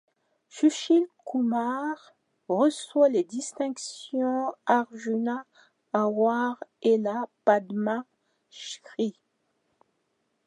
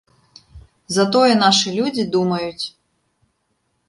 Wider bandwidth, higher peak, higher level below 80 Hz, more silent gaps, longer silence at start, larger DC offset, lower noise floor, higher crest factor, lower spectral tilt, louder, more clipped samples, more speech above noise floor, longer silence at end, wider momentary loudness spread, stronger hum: about the same, 11 kHz vs 11.5 kHz; second, -8 dBFS vs -2 dBFS; second, -86 dBFS vs -54 dBFS; neither; about the same, 0.55 s vs 0.55 s; neither; first, -75 dBFS vs -69 dBFS; about the same, 20 dB vs 18 dB; about the same, -4.5 dB/octave vs -4 dB/octave; second, -27 LUFS vs -17 LUFS; neither; about the same, 49 dB vs 52 dB; first, 1.35 s vs 1.2 s; about the same, 11 LU vs 13 LU; neither